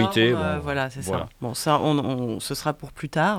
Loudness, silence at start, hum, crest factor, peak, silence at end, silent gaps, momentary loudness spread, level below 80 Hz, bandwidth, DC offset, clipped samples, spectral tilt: -25 LUFS; 0 s; none; 18 dB; -6 dBFS; 0 s; none; 9 LU; -52 dBFS; 19 kHz; under 0.1%; under 0.1%; -5 dB/octave